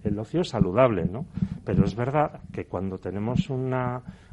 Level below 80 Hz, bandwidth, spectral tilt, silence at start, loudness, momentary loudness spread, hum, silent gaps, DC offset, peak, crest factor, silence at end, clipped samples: -44 dBFS; 9.2 kHz; -8 dB/octave; 0 s; -26 LUFS; 10 LU; none; none; under 0.1%; -6 dBFS; 20 dB; 0.15 s; under 0.1%